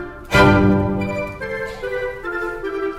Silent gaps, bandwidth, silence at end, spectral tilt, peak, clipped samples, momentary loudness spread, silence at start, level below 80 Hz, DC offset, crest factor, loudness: none; 16 kHz; 0 s; -6.5 dB/octave; 0 dBFS; under 0.1%; 13 LU; 0 s; -34 dBFS; under 0.1%; 18 dB; -19 LUFS